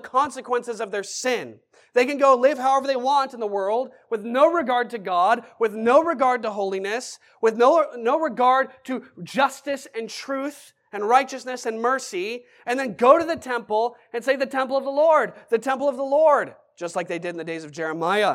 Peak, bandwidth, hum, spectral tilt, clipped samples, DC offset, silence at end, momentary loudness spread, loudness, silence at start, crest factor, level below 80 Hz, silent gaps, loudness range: -2 dBFS; 15 kHz; none; -3.5 dB/octave; under 0.1%; under 0.1%; 0 s; 12 LU; -22 LUFS; 0.05 s; 20 dB; -78 dBFS; none; 4 LU